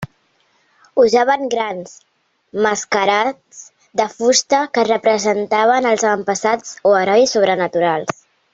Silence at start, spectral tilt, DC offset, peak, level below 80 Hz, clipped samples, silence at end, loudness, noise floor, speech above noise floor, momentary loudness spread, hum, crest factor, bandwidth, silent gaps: 0 s; -3 dB/octave; under 0.1%; -2 dBFS; -60 dBFS; under 0.1%; 0.45 s; -16 LUFS; -60 dBFS; 44 dB; 11 LU; none; 16 dB; 8 kHz; none